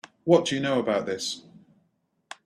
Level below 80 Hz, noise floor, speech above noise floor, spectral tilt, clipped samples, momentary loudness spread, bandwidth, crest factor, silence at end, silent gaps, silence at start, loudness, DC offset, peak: -68 dBFS; -71 dBFS; 47 dB; -4.5 dB/octave; under 0.1%; 14 LU; 13 kHz; 22 dB; 1.05 s; none; 0.25 s; -25 LUFS; under 0.1%; -6 dBFS